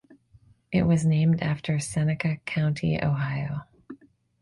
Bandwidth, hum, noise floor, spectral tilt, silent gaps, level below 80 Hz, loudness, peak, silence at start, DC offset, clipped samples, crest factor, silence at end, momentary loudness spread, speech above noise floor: 11.5 kHz; none; -58 dBFS; -7 dB/octave; none; -52 dBFS; -26 LUFS; -12 dBFS; 0.7 s; under 0.1%; under 0.1%; 14 dB; 0.45 s; 9 LU; 34 dB